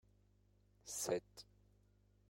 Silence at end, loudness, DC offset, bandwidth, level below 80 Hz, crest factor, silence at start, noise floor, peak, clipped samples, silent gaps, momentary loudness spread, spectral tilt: 0.9 s; -43 LUFS; under 0.1%; 16 kHz; -74 dBFS; 24 dB; 0.85 s; -73 dBFS; -26 dBFS; under 0.1%; none; 19 LU; -3 dB/octave